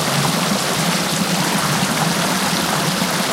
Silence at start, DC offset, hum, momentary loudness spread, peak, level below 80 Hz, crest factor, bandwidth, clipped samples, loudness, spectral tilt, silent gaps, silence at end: 0 s; under 0.1%; none; 1 LU; -2 dBFS; -50 dBFS; 16 dB; 16 kHz; under 0.1%; -17 LUFS; -3 dB/octave; none; 0 s